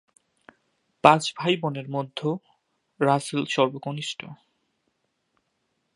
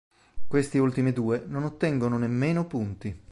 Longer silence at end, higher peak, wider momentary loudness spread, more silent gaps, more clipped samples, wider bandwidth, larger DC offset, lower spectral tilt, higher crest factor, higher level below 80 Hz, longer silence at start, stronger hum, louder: first, 1.6 s vs 0 s; first, 0 dBFS vs -10 dBFS; first, 14 LU vs 8 LU; neither; neither; about the same, 11.5 kHz vs 11.5 kHz; neither; second, -5 dB/octave vs -8 dB/octave; first, 26 dB vs 16 dB; second, -72 dBFS vs -52 dBFS; first, 1.05 s vs 0.1 s; neither; first, -24 LUFS vs -27 LUFS